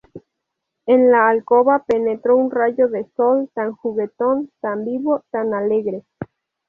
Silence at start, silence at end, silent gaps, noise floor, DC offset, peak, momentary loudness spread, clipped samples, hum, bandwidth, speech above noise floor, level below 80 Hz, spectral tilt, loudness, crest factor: 0.15 s; 0.45 s; none; -79 dBFS; under 0.1%; -2 dBFS; 12 LU; under 0.1%; none; 3.7 kHz; 61 dB; -62 dBFS; -8.5 dB/octave; -18 LUFS; 16 dB